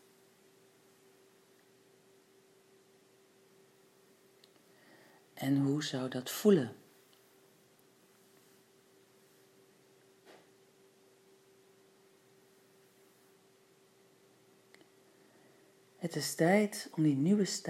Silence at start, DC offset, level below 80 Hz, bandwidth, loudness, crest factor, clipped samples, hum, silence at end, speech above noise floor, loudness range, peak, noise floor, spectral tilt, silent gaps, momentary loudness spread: 5.35 s; under 0.1%; under -90 dBFS; 16 kHz; -32 LUFS; 24 dB; under 0.1%; none; 0 s; 35 dB; 9 LU; -14 dBFS; -66 dBFS; -5.5 dB/octave; none; 14 LU